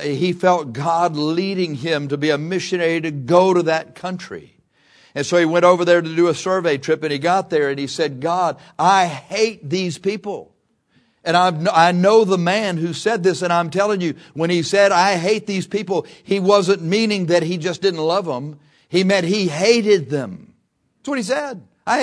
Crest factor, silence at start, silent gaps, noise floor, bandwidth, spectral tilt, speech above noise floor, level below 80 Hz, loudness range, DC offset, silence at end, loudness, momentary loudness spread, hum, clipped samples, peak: 18 dB; 0 s; none; -65 dBFS; 11 kHz; -5 dB/octave; 47 dB; -66 dBFS; 3 LU; under 0.1%; 0 s; -18 LUFS; 11 LU; none; under 0.1%; 0 dBFS